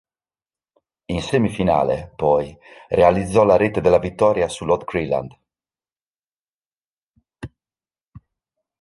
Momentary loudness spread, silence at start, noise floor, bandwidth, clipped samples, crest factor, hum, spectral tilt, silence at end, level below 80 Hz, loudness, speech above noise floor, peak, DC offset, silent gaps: 19 LU; 1.1 s; under -90 dBFS; 11.5 kHz; under 0.1%; 20 dB; none; -6.5 dB/octave; 0.6 s; -44 dBFS; -19 LUFS; over 72 dB; -2 dBFS; under 0.1%; 6.08-6.14 s, 6.34-6.71 s, 6.77-7.07 s, 8.08-8.12 s